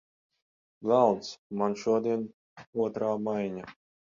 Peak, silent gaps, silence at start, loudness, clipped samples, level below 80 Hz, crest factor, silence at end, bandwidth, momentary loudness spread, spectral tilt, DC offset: -10 dBFS; 1.38-1.50 s, 2.34-2.56 s, 2.67-2.73 s; 0.8 s; -29 LUFS; under 0.1%; -72 dBFS; 22 dB; 0.45 s; 7.6 kHz; 14 LU; -6.5 dB/octave; under 0.1%